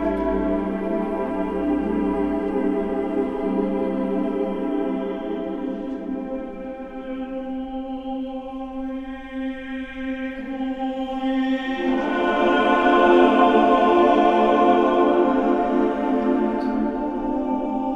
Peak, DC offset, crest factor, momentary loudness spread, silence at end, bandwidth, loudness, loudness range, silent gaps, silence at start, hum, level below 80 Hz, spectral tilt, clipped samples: -2 dBFS; under 0.1%; 18 dB; 14 LU; 0 s; 7.8 kHz; -22 LUFS; 13 LU; none; 0 s; none; -44 dBFS; -7 dB/octave; under 0.1%